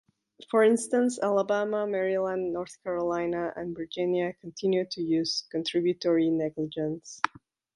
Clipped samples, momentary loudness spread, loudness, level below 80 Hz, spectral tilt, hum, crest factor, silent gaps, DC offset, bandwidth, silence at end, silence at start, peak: under 0.1%; 9 LU; -28 LUFS; -68 dBFS; -5 dB/octave; none; 24 dB; none; under 0.1%; 11.5 kHz; 0.5 s; 0.4 s; -4 dBFS